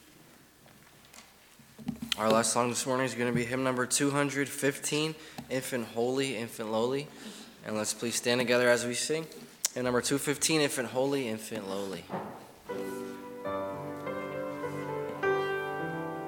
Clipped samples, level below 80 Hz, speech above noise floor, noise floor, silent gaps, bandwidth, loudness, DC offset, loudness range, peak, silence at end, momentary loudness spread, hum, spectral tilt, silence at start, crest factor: under 0.1%; -68 dBFS; 27 dB; -57 dBFS; none; 19 kHz; -31 LUFS; under 0.1%; 7 LU; -6 dBFS; 0 s; 14 LU; none; -3.5 dB/octave; 0.65 s; 26 dB